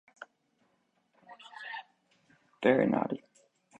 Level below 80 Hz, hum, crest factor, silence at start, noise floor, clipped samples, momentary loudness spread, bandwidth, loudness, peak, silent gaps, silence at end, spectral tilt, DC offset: -74 dBFS; none; 24 dB; 0.2 s; -74 dBFS; under 0.1%; 26 LU; 8.6 kHz; -31 LUFS; -12 dBFS; none; 0.65 s; -7.5 dB/octave; under 0.1%